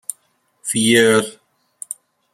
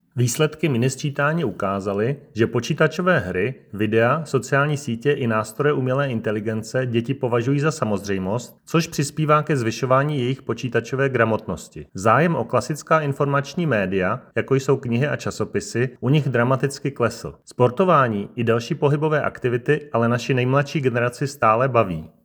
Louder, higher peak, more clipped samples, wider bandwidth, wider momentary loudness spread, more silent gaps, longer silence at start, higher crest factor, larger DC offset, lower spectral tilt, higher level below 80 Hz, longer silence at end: first, -15 LUFS vs -21 LUFS; about the same, -2 dBFS vs -2 dBFS; neither; second, 15 kHz vs over 20 kHz; first, 19 LU vs 7 LU; neither; first, 0.65 s vs 0.15 s; about the same, 18 dB vs 20 dB; neither; second, -3 dB/octave vs -6 dB/octave; about the same, -62 dBFS vs -58 dBFS; first, 0.4 s vs 0.15 s